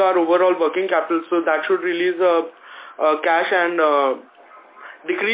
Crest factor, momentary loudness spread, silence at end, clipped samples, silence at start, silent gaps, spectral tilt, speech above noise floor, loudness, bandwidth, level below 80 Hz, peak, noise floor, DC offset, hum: 14 dB; 13 LU; 0 s; under 0.1%; 0 s; none; -7.5 dB/octave; 27 dB; -19 LUFS; 4 kHz; -74 dBFS; -4 dBFS; -45 dBFS; under 0.1%; none